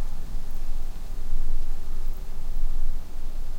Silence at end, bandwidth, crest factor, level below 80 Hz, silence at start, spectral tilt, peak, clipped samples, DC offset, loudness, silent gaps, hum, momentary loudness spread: 0 s; 1.4 kHz; 10 dB; -24 dBFS; 0 s; -6 dB/octave; -10 dBFS; under 0.1%; under 0.1%; -36 LUFS; none; none; 6 LU